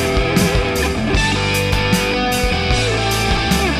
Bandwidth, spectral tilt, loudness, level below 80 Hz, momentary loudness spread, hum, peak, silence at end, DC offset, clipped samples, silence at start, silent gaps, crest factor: 16 kHz; -4.5 dB/octave; -16 LUFS; -24 dBFS; 2 LU; none; -2 dBFS; 0 s; under 0.1%; under 0.1%; 0 s; none; 16 dB